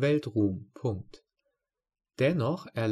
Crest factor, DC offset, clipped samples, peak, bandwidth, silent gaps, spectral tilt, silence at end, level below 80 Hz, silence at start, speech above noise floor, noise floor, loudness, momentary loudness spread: 16 dB; under 0.1%; under 0.1%; -16 dBFS; 12.5 kHz; none; -8 dB/octave; 0 s; -66 dBFS; 0 s; 59 dB; -88 dBFS; -30 LUFS; 8 LU